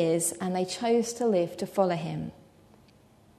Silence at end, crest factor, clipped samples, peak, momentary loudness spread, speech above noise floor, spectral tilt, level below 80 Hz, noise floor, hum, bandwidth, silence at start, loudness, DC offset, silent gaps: 1.05 s; 18 dB; under 0.1%; -10 dBFS; 9 LU; 31 dB; -5 dB/octave; -66 dBFS; -58 dBFS; none; 13.5 kHz; 0 s; -28 LUFS; under 0.1%; none